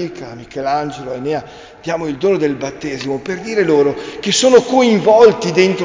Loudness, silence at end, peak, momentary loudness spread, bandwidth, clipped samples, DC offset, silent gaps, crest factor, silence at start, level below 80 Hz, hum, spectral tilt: -15 LUFS; 0 s; 0 dBFS; 14 LU; 7.6 kHz; under 0.1%; under 0.1%; none; 14 dB; 0 s; -50 dBFS; none; -4.5 dB/octave